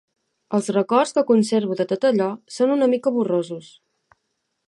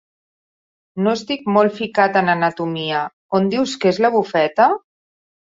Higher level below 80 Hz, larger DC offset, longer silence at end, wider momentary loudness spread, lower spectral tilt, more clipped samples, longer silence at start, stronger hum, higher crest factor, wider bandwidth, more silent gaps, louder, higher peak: second, -74 dBFS vs -64 dBFS; neither; first, 1.1 s vs 0.8 s; about the same, 7 LU vs 7 LU; about the same, -6 dB/octave vs -5.5 dB/octave; neither; second, 0.5 s vs 0.95 s; neither; about the same, 18 dB vs 18 dB; first, 11.5 kHz vs 7.8 kHz; second, none vs 3.13-3.29 s; about the same, -20 LUFS vs -18 LUFS; about the same, -4 dBFS vs -2 dBFS